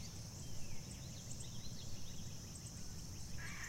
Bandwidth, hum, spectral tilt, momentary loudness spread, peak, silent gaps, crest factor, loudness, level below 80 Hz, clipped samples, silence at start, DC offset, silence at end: 16 kHz; none; -3.5 dB/octave; 1 LU; -32 dBFS; none; 12 dB; -50 LUFS; -56 dBFS; under 0.1%; 0 s; under 0.1%; 0 s